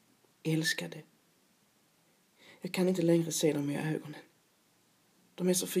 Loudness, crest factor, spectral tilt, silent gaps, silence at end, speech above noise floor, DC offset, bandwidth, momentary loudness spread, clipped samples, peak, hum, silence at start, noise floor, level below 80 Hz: -32 LUFS; 20 dB; -4.5 dB/octave; none; 0 s; 38 dB; under 0.1%; 15.5 kHz; 17 LU; under 0.1%; -16 dBFS; none; 0.45 s; -69 dBFS; -88 dBFS